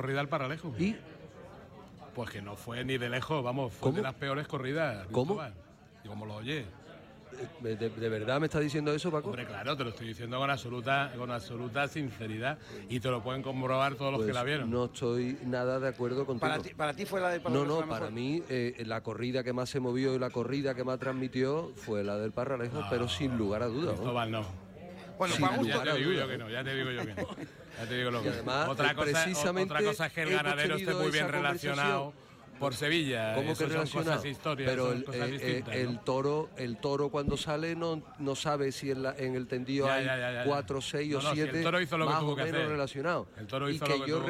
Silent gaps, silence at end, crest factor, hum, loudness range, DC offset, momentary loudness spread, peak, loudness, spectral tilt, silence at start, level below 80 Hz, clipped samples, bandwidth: none; 0 s; 18 dB; none; 4 LU; under 0.1%; 10 LU; -14 dBFS; -33 LUFS; -5 dB/octave; 0 s; -60 dBFS; under 0.1%; 16 kHz